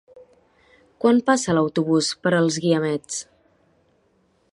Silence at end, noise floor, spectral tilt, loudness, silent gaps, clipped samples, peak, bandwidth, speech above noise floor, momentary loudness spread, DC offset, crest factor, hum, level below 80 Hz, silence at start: 1.3 s; -64 dBFS; -5 dB/octave; -21 LUFS; none; under 0.1%; -4 dBFS; 11.5 kHz; 44 dB; 8 LU; under 0.1%; 18 dB; none; -62 dBFS; 0.15 s